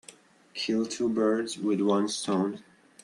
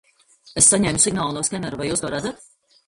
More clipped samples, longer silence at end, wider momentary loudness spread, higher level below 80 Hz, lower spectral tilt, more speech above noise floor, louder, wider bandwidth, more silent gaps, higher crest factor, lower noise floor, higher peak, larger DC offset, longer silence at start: neither; second, 0.4 s vs 0.55 s; second, 8 LU vs 14 LU; second, -74 dBFS vs -48 dBFS; first, -5 dB/octave vs -3 dB/octave; second, 27 dB vs 32 dB; second, -28 LUFS vs -18 LUFS; about the same, 12 kHz vs 11.5 kHz; neither; second, 16 dB vs 22 dB; about the same, -54 dBFS vs -52 dBFS; second, -12 dBFS vs 0 dBFS; neither; second, 0.1 s vs 0.45 s